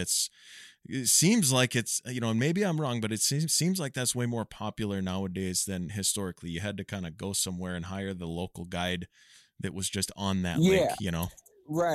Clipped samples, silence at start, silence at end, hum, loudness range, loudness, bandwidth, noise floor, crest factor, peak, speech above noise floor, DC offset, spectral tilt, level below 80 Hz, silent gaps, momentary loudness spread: under 0.1%; 0 s; 0 s; none; 8 LU; -29 LUFS; 15.5 kHz; -52 dBFS; 20 dB; -10 dBFS; 23 dB; under 0.1%; -4 dB/octave; -56 dBFS; none; 13 LU